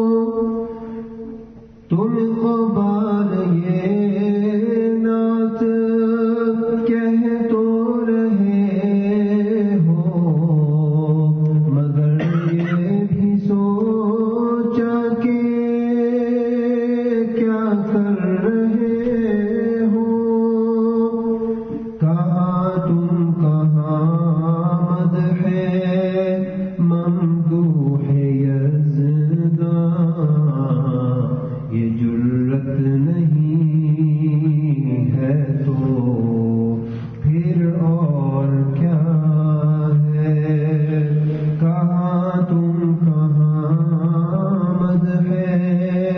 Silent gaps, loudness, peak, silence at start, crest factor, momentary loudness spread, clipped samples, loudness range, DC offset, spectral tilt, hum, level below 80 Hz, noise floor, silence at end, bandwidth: none; -18 LUFS; -6 dBFS; 0 s; 12 dB; 3 LU; under 0.1%; 2 LU; under 0.1%; -12 dB/octave; none; -52 dBFS; -40 dBFS; 0 s; 4.1 kHz